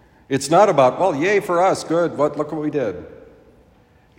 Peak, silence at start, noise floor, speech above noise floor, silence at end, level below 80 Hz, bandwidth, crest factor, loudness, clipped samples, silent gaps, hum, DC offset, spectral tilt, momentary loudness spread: 0 dBFS; 0.3 s; -53 dBFS; 35 dB; 1.05 s; -58 dBFS; 16 kHz; 18 dB; -18 LUFS; under 0.1%; none; none; under 0.1%; -5 dB/octave; 10 LU